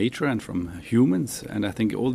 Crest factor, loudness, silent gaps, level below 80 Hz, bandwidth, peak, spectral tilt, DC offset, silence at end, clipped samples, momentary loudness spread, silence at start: 14 dB; -25 LUFS; none; -52 dBFS; 15.5 kHz; -10 dBFS; -6 dB/octave; under 0.1%; 0 s; under 0.1%; 9 LU; 0 s